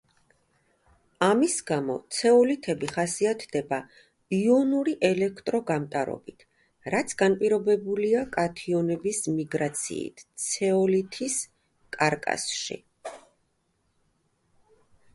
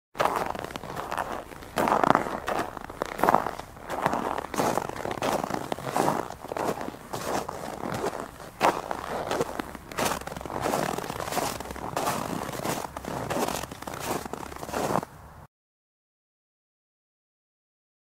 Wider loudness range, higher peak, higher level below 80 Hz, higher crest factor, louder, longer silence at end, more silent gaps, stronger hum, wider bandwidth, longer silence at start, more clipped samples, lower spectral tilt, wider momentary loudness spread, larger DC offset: about the same, 5 LU vs 7 LU; second, -8 dBFS vs -2 dBFS; second, -66 dBFS vs -52 dBFS; second, 20 dB vs 30 dB; first, -26 LUFS vs -30 LUFS; second, 1.95 s vs 2.6 s; neither; neither; second, 11.5 kHz vs 16 kHz; first, 1.2 s vs 0.15 s; neither; about the same, -4.5 dB/octave vs -4 dB/octave; about the same, 11 LU vs 10 LU; neither